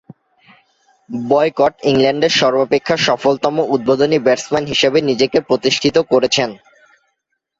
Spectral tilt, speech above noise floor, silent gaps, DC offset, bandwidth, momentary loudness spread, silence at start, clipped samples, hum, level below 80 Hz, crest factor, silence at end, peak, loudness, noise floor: -4 dB/octave; 57 dB; none; under 0.1%; 7.8 kHz; 4 LU; 1.1 s; under 0.1%; none; -52 dBFS; 14 dB; 1.05 s; -2 dBFS; -15 LUFS; -72 dBFS